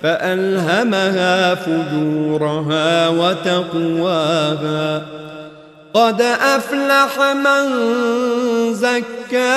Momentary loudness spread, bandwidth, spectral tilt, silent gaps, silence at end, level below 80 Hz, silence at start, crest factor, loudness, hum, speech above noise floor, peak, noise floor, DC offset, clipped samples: 6 LU; 13.5 kHz; -5 dB/octave; none; 0 s; -62 dBFS; 0 s; 14 dB; -16 LUFS; none; 23 dB; -2 dBFS; -39 dBFS; under 0.1%; under 0.1%